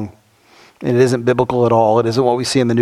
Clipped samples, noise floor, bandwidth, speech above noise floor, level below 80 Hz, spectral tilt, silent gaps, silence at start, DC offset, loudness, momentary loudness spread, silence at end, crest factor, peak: under 0.1%; -49 dBFS; 13.5 kHz; 35 dB; -50 dBFS; -6 dB/octave; none; 0 s; under 0.1%; -15 LUFS; 6 LU; 0 s; 16 dB; 0 dBFS